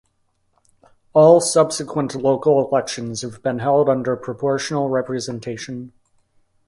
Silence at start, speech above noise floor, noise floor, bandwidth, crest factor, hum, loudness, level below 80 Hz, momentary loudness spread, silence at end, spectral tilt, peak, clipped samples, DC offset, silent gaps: 1.15 s; 48 dB; -66 dBFS; 11.5 kHz; 18 dB; none; -19 LUFS; -60 dBFS; 15 LU; 0.8 s; -5 dB/octave; 0 dBFS; under 0.1%; under 0.1%; none